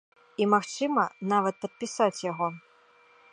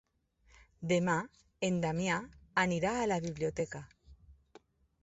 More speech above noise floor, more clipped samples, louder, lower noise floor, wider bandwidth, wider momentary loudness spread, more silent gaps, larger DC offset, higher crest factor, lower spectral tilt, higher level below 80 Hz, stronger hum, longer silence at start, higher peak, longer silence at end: second, 32 dB vs 36 dB; neither; first, -28 LUFS vs -34 LUFS; second, -60 dBFS vs -69 dBFS; first, 11 kHz vs 8 kHz; about the same, 11 LU vs 10 LU; neither; neither; about the same, 20 dB vs 20 dB; about the same, -5 dB/octave vs -5 dB/octave; second, -82 dBFS vs -62 dBFS; neither; second, 0.4 s vs 0.8 s; first, -10 dBFS vs -16 dBFS; about the same, 0.75 s vs 0.7 s